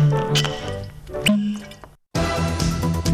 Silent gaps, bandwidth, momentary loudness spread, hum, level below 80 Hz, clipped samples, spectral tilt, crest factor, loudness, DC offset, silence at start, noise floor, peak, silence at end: none; 15.5 kHz; 13 LU; none; -36 dBFS; under 0.1%; -5 dB/octave; 14 dB; -22 LUFS; under 0.1%; 0 s; -43 dBFS; -8 dBFS; 0 s